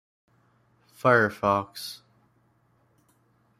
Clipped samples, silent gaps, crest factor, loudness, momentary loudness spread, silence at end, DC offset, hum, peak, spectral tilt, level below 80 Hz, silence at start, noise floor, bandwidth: under 0.1%; none; 24 dB; -24 LUFS; 18 LU; 1.65 s; under 0.1%; none; -6 dBFS; -5.5 dB/octave; -66 dBFS; 1.05 s; -66 dBFS; 15.5 kHz